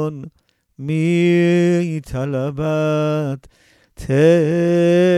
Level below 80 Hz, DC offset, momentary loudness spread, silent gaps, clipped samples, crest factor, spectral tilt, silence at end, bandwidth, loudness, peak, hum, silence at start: -46 dBFS; under 0.1%; 13 LU; none; under 0.1%; 14 dB; -7.5 dB/octave; 0 s; 12 kHz; -17 LUFS; -2 dBFS; none; 0 s